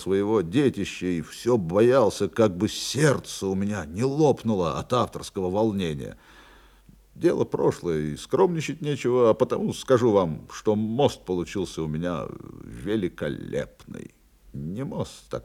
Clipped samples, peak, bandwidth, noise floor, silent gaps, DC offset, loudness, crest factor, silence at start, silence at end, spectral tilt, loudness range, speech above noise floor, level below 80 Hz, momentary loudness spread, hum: under 0.1%; -6 dBFS; 15.5 kHz; -54 dBFS; none; under 0.1%; -25 LUFS; 18 dB; 0 s; 0 s; -6 dB/octave; 8 LU; 29 dB; -54 dBFS; 13 LU; none